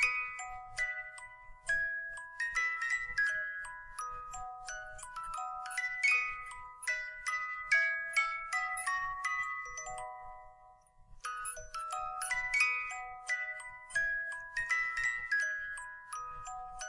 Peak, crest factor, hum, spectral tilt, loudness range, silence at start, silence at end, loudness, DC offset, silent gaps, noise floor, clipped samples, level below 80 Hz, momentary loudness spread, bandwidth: -16 dBFS; 20 dB; none; 1 dB/octave; 5 LU; 0 s; 0 s; -35 LUFS; under 0.1%; none; -60 dBFS; under 0.1%; -60 dBFS; 15 LU; 11.5 kHz